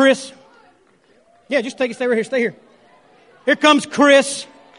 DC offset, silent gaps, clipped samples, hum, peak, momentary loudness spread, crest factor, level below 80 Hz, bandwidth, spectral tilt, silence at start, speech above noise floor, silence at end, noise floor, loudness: under 0.1%; none; under 0.1%; none; 0 dBFS; 12 LU; 18 dB; -70 dBFS; 11 kHz; -3 dB/octave; 0 s; 39 dB; 0.35 s; -55 dBFS; -17 LUFS